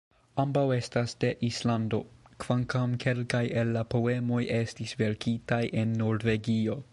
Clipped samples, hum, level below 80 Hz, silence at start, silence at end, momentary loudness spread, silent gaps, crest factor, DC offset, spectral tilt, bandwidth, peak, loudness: under 0.1%; none; -56 dBFS; 0.35 s; 0.1 s; 4 LU; none; 18 dB; under 0.1%; -6.5 dB/octave; 11.5 kHz; -12 dBFS; -29 LUFS